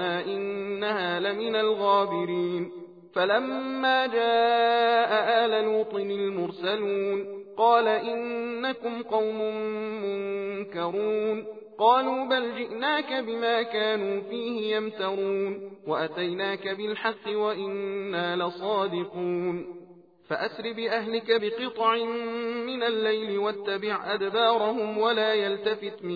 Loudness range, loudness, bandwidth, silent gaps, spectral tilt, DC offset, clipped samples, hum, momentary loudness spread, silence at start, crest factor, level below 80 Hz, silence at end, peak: 6 LU; -27 LUFS; 5 kHz; none; -6.5 dB/octave; under 0.1%; under 0.1%; none; 9 LU; 0 s; 18 dB; -78 dBFS; 0 s; -8 dBFS